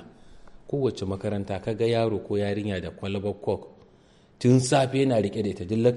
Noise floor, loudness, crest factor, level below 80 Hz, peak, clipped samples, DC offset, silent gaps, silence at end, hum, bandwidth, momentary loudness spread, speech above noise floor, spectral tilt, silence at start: -56 dBFS; -26 LUFS; 18 dB; -56 dBFS; -8 dBFS; under 0.1%; under 0.1%; none; 0 s; none; 11.5 kHz; 10 LU; 32 dB; -6.5 dB/octave; 0 s